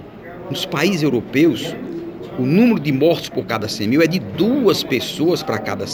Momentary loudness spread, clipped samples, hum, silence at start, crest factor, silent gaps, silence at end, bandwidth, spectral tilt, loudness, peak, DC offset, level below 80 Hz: 13 LU; under 0.1%; none; 0 s; 16 dB; none; 0 s; over 20 kHz; -5.5 dB/octave; -18 LUFS; -2 dBFS; under 0.1%; -52 dBFS